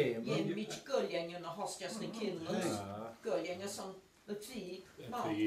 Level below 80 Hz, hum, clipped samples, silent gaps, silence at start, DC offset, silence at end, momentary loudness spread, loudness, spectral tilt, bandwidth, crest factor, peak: -76 dBFS; none; under 0.1%; none; 0 s; under 0.1%; 0 s; 10 LU; -40 LUFS; -5 dB/octave; 15 kHz; 18 dB; -22 dBFS